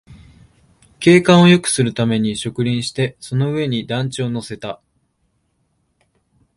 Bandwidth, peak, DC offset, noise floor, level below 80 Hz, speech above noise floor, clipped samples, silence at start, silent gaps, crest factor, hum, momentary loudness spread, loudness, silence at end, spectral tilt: 11.5 kHz; 0 dBFS; under 0.1%; -66 dBFS; -52 dBFS; 50 dB; under 0.1%; 0.1 s; none; 18 dB; none; 16 LU; -16 LUFS; 1.8 s; -5.5 dB/octave